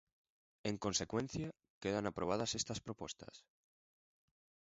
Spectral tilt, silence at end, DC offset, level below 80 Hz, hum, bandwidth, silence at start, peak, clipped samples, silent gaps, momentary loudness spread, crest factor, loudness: -4 dB/octave; 1.25 s; under 0.1%; -66 dBFS; none; 7.6 kHz; 0.65 s; -22 dBFS; under 0.1%; 1.70-1.81 s; 11 LU; 22 dB; -41 LUFS